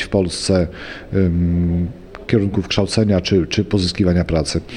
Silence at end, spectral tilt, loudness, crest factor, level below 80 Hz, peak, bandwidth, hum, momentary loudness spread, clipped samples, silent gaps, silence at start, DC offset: 0 s; -6 dB/octave; -18 LUFS; 16 dB; -34 dBFS; -2 dBFS; 11 kHz; none; 7 LU; under 0.1%; none; 0 s; under 0.1%